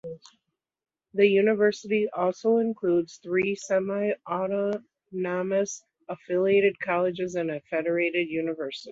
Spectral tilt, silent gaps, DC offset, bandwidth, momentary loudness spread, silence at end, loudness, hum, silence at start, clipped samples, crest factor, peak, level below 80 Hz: -5.5 dB/octave; none; under 0.1%; 7.8 kHz; 12 LU; 0 s; -26 LUFS; none; 0.05 s; under 0.1%; 18 dB; -8 dBFS; -72 dBFS